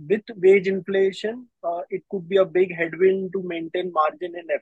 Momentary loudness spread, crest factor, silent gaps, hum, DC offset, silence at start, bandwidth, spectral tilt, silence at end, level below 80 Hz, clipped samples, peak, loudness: 13 LU; 16 dB; none; none; under 0.1%; 0 s; 8 kHz; -7 dB/octave; 0.05 s; -72 dBFS; under 0.1%; -6 dBFS; -23 LUFS